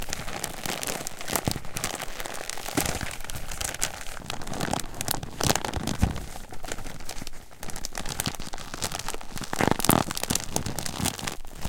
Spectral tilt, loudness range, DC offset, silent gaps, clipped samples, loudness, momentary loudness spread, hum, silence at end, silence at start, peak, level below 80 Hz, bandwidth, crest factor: -3 dB/octave; 6 LU; under 0.1%; none; under 0.1%; -30 LUFS; 12 LU; none; 0 s; 0 s; -2 dBFS; -38 dBFS; 17 kHz; 28 dB